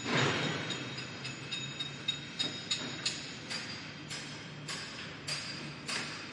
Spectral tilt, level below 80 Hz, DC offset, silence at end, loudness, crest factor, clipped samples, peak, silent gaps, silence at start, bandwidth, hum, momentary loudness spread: -3 dB/octave; -70 dBFS; under 0.1%; 0 s; -37 LUFS; 20 dB; under 0.1%; -18 dBFS; none; 0 s; 11.5 kHz; none; 8 LU